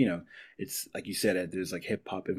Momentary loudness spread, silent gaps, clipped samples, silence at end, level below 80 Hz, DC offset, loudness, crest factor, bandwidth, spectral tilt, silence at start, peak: 10 LU; none; under 0.1%; 0 s; -66 dBFS; under 0.1%; -33 LUFS; 20 dB; 16 kHz; -4.5 dB/octave; 0 s; -12 dBFS